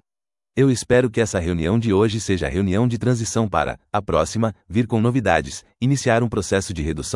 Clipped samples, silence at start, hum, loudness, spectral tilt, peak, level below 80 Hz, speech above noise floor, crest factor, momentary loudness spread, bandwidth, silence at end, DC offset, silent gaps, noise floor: under 0.1%; 0.55 s; none; -20 LUFS; -6 dB/octave; 0 dBFS; -42 dBFS; over 70 dB; 20 dB; 6 LU; 12 kHz; 0 s; under 0.1%; none; under -90 dBFS